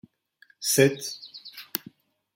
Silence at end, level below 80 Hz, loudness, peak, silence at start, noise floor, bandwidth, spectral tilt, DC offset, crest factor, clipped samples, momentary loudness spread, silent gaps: 0.6 s; -68 dBFS; -25 LUFS; -6 dBFS; 0.6 s; -61 dBFS; 16.5 kHz; -3.5 dB/octave; under 0.1%; 24 dB; under 0.1%; 20 LU; none